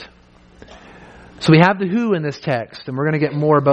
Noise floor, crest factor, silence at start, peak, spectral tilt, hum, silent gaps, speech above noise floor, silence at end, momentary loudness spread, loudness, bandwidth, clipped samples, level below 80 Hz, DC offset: -48 dBFS; 18 dB; 0 s; 0 dBFS; -7.5 dB/octave; none; none; 32 dB; 0 s; 11 LU; -17 LUFS; 9.2 kHz; under 0.1%; -52 dBFS; under 0.1%